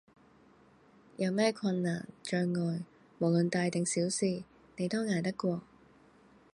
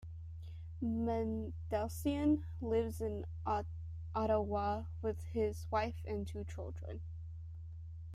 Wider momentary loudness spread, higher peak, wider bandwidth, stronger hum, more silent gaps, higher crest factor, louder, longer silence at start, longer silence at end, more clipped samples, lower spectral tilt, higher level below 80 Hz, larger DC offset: second, 11 LU vs 14 LU; first, -14 dBFS vs -20 dBFS; second, 11.5 kHz vs 14.5 kHz; neither; neither; about the same, 20 dB vs 18 dB; first, -33 LUFS vs -39 LUFS; first, 1.2 s vs 0 s; first, 0.9 s vs 0 s; neither; second, -5.5 dB/octave vs -7.5 dB/octave; second, -74 dBFS vs -52 dBFS; neither